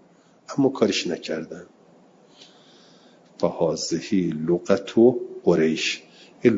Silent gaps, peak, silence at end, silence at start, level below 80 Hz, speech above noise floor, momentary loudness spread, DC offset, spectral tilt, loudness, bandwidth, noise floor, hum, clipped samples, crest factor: none; -4 dBFS; 0 s; 0.5 s; -66 dBFS; 32 dB; 13 LU; under 0.1%; -5 dB/octave; -23 LUFS; 7.8 kHz; -54 dBFS; none; under 0.1%; 20 dB